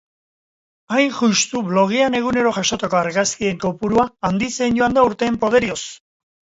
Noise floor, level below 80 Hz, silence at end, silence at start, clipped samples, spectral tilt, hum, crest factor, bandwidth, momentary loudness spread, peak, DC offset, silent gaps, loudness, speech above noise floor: under -90 dBFS; -50 dBFS; 0.65 s; 0.9 s; under 0.1%; -4 dB/octave; none; 16 dB; 8 kHz; 5 LU; -2 dBFS; under 0.1%; none; -18 LUFS; over 72 dB